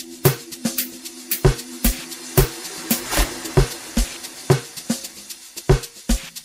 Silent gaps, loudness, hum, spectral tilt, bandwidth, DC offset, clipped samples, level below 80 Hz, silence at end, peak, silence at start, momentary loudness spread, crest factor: none; -22 LUFS; none; -4.5 dB/octave; 16.5 kHz; under 0.1%; under 0.1%; -28 dBFS; 0 s; 0 dBFS; 0 s; 10 LU; 22 dB